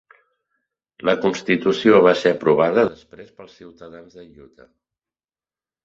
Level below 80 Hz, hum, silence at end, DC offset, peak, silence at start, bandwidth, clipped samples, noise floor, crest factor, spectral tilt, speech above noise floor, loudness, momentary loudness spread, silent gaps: -62 dBFS; none; 1.6 s; under 0.1%; -2 dBFS; 1.05 s; 7.6 kHz; under 0.1%; under -90 dBFS; 20 dB; -6 dB/octave; over 71 dB; -17 LUFS; 8 LU; none